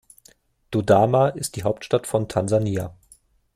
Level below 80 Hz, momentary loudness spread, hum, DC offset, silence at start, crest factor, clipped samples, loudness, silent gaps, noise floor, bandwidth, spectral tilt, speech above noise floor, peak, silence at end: -54 dBFS; 10 LU; none; under 0.1%; 0.7 s; 18 dB; under 0.1%; -22 LUFS; none; -57 dBFS; 16 kHz; -6 dB/octave; 36 dB; -4 dBFS; 0.65 s